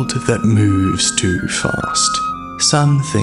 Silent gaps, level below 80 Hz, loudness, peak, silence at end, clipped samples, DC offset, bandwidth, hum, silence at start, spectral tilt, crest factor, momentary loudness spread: none; -40 dBFS; -15 LUFS; 0 dBFS; 0 s; under 0.1%; under 0.1%; 11.5 kHz; none; 0 s; -4 dB/octave; 16 dB; 5 LU